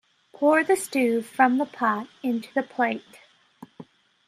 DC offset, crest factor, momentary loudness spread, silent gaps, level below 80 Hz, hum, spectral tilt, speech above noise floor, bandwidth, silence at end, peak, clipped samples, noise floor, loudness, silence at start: under 0.1%; 20 dB; 8 LU; none; -78 dBFS; none; -4 dB/octave; 27 dB; 15 kHz; 0.45 s; -4 dBFS; under 0.1%; -50 dBFS; -24 LUFS; 0.4 s